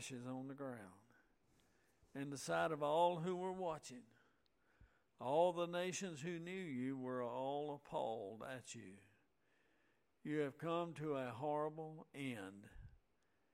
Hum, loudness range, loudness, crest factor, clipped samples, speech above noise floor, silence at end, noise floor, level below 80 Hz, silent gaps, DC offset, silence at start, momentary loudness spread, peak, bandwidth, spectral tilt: none; 5 LU; -44 LUFS; 22 dB; under 0.1%; 39 dB; 0.6 s; -82 dBFS; -76 dBFS; none; under 0.1%; 0 s; 18 LU; -24 dBFS; 16 kHz; -5 dB/octave